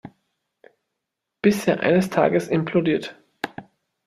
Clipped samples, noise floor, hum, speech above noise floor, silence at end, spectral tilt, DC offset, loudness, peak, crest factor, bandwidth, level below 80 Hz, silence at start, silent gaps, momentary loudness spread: under 0.1%; -82 dBFS; none; 62 dB; 0.45 s; -6.5 dB/octave; under 0.1%; -21 LUFS; -4 dBFS; 20 dB; 14 kHz; -62 dBFS; 0.05 s; none; 14 LU